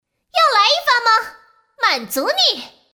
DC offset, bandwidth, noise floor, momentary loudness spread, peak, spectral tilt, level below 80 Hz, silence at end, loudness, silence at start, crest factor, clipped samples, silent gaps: under 0.1%; over 20 kHz; -47 dBFS; 9 LU; -2 dBFS; 0 dB/octave; -68 dBFS; 0.25 s; -15 LUFS; 0.35 s; 16 dB; under 0.1%; none